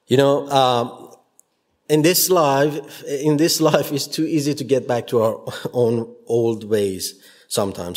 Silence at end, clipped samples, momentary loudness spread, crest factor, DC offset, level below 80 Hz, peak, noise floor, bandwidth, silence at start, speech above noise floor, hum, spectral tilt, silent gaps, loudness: 0 s; under 0.1%; 10 LU; 20 dB; under 0.1%; -64 dBFS; 0 dBFS; -60 dBFS; 16.5 kHz; 0.1 s; 41 dB; none; -4.5 dB/octave; none; -19 LUFS